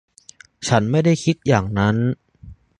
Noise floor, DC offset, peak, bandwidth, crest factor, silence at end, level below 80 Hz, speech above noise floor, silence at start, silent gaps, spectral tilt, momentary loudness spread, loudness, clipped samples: -48 dBFS; under 0.1%; -2 dBFS; 10.5 kHz; 20 dB; 0.25 s; -44 dBFS; 30 dB; 0.6 s; none; -6 dB/octave; 8 LU; -19 LUFS; under 0.1%